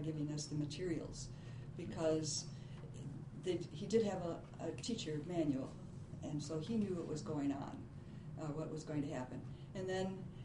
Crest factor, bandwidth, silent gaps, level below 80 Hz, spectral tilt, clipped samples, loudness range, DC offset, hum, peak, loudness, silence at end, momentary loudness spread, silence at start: 20 dB; 10.5 kHz; none; -62 dBFS; -5.5 dB/octave; under 0.1%; 2 LU; under 0.1%; none; -24 dBFS; -43 LUFS; 0 s; 12 LU; 0 s